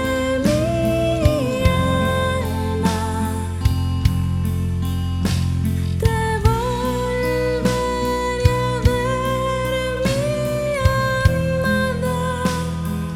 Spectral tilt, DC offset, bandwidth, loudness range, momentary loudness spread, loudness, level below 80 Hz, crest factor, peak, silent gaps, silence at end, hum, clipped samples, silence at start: -6 dB/octave; under 0.1%; 16.5 kHz; 2 LU; 4 LU; -20 LUFS; -28 dBFS; 18 dB; -2 dBFS; none; 0 s; none; under 0.1%; 0 s